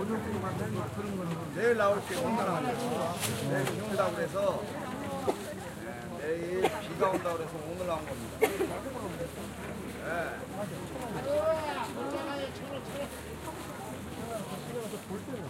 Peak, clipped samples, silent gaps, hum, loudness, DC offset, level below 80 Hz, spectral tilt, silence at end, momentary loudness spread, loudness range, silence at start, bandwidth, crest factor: -10 dBFS; under 0.1%; none; none; -34 LUFS; under 0.1%; -56 dBFS; -5 dB/octave; 0 s; 10 LU; 5 LU; 0 s; 16 kHz; 24 dB